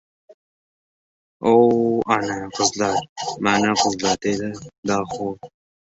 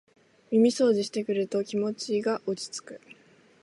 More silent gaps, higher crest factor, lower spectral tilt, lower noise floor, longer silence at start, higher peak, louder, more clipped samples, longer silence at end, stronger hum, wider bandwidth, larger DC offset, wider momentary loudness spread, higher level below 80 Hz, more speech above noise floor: first, 3.09-3.16 s, 4.78-4.83 s vs none; about the same, 20 dB vs 18 dB; about the same, -4 dB/octave vs -5 dB/octave; first, under -90 dBFS vs -58 dBFS; first, 1.4 s vs 0.5 s; first, -2 dBFS vs -10 dBFS; first, -20 LUFS vs -27 LUFS; neither; about the same, 0.4 s vs 0.5 s; neither; second, 8 kHz vs 11.5 kHz; neither; about the same, 13 LU vs 15 LU; first, -56 dBFS vs -78 dBFS; first, over 70 dB vs 32 dB